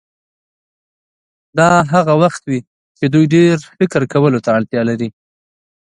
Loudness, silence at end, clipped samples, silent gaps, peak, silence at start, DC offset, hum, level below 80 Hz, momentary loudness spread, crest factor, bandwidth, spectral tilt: -14 LUFS; 0.85 s; under 0.1%; 2.67-2.95 s; 0 dBFS; 1.55 s; under 0.1%; none; -54 dBFS; 11 LU; 16 dB; 11 kHz; -7 dB/octave